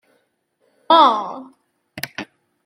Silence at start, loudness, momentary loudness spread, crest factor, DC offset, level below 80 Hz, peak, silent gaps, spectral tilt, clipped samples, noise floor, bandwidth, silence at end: 0.9 s; -15 LUFS; 23 LU; 20 dB; under 0.1%; -74 dBFS; -2 dBFS; none; -3.5 dB/octave; under 0.1%; -67 dBFS; 16.5 kHz; 0.4 s